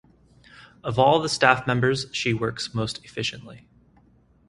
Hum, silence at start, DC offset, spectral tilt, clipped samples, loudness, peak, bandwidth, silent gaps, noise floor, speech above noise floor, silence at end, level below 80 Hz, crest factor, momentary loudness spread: none; 0.6 s; under 0.1%; -4.5 dB/octave; under 0.1%; -23 LUFS; 0 dBFS; 11.5 kHz; none; -58 dBFS; 35 dB; 0.9 s; -54 dBFS; 24 dB; 11 LU